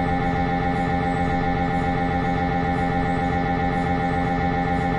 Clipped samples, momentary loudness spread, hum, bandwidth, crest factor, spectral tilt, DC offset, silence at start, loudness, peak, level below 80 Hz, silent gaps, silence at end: under 0.1%; 0 LU; none; 10.5 kHz; 10 dB; -8 dB/octave; under 0.1%; 0 s; -22 LUFS; -12 dBFS; -34 dBFS; none; 0 s